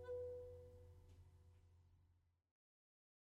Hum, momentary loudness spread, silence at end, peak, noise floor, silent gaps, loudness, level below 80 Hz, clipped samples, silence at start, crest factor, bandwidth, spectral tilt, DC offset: none; 17 LU; 0.9 s; -42 dBFS; -76 dBFS; none; -55 LUFS; -76 dBFS; under 0.1%; 0 s; 16 dB; 11 kHz; -7.5 dB/octave; under 0.1%